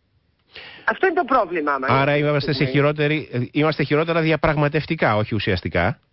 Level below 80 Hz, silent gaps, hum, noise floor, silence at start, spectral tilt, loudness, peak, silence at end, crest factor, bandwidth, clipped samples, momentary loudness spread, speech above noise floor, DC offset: -42 dBFS; none; none; -64 dBFS; 0.55 s; -11 dB/octave; -20 LUFS; -6 dBFS; 0.2 s; 14 dB; 5.8 kHz; under 0.1%; 5 LU; 44 dB; under 0.1%